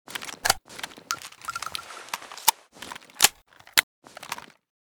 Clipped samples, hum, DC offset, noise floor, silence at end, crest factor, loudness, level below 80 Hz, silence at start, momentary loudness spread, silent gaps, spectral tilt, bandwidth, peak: under 0.1%; none; under 0.1%; -47 dBFS; 0.4 s; 30 dB; -26 LUFS; -60 dBFS; 0.1 s; 19 LU; 3.83-4.02 s; 1 dB/octave; over 20 kHz; 0 dBFS